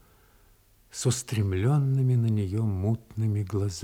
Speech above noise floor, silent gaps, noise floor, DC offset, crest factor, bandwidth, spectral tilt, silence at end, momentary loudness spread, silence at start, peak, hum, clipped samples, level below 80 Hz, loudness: 34 dB; none; -60 dBFS; under 0.1%; 14 dB; 15.5 kHz; -6.5 dB/octave; 0 s; 6 LU; 0.95 s; -12 dBFS; none; under 0.1%; -60 dBFS; -27 LUFS